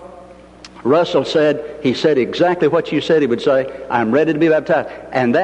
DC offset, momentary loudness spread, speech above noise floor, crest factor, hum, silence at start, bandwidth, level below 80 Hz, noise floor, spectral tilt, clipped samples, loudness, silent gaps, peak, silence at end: under 0.1%; 5 LU; 24 dB; 14 dB; none; 0 s; 9 kHz; -52 dBFS; -40 dBFS; -6.5 dB/octave; under 0.1%; -16 LUFS; none; -2 dBFS; 0 s